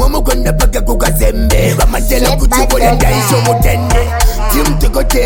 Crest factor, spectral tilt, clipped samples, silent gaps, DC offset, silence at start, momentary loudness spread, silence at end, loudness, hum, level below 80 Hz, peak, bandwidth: 10 dB; -4.5 dB/octave; under 0.1%; none; under 0.1%; 0 s; 3 LU; 0 s; -12 LUFS; none; -12 dBFS; 0 dBFS; 17.5 kHz